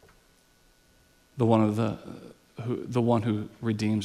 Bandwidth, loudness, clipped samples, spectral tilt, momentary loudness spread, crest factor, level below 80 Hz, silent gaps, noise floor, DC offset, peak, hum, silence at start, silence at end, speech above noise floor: 12.5 kHz; -27 LUFS; under 0.1%; -8 dB/octave; 22 LU; 20 dB; -62 dBFS; none; -62 dBFS; under 0.1%; -10 dBFS; none; 1.35 s; 0 s; 36 dB